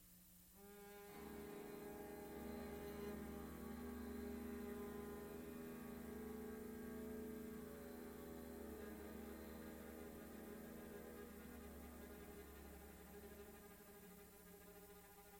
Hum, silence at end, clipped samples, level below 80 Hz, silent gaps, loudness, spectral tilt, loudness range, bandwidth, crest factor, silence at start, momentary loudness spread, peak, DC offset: none; 0 s; under 0.1%; -66 dBFS; none; -55 LUFS; -5.5 dB/octave; 6 LU; 16.5 kHz; 14 dB; 0 s; 10 LU; -40 dBFS; under 0.1%